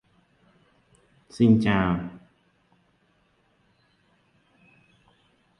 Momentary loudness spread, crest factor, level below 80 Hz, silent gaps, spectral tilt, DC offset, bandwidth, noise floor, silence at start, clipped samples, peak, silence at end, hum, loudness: 21 LU; 22 dB; -52 dBFS; none; -8 dB/octave; under 0.1%; 9.8 kHz; -66 dBFS; 1.35 s; under 0.1%; -6 dBFS; 3.4 s; none; -22 LUFS